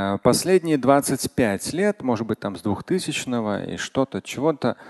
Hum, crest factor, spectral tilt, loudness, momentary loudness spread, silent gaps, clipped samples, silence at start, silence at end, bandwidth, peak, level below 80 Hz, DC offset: none; 20 dB; -5 dB/octave; -23 LUFS; 8 LU; none; under 0.1%; 0 s; 0 s; 12.5 kHz; -2 dBFS; -52 dBFS; under 0.1%